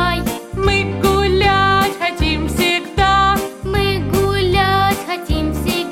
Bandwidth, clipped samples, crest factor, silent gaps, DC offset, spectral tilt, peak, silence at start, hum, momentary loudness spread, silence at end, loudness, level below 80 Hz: 16.5 kHz; under 0.1%; 14 dB; none; under 0.1%; -5 dB/octave; -2 dBFS; 0 s; none; 7 LU; 0 s; -16 LUFS; -26 dBFS